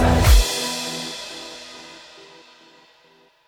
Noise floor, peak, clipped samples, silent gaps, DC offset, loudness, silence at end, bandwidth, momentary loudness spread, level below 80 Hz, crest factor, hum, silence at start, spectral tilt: -56 dBFS; -2 dBFS; under 0.1%; none; under 0.1%; -20 LUFS; 1.5 s; 18.5 kHz; 26 LU; -24 dBFS; 18 dB; none; 0 s; -4 dB/octave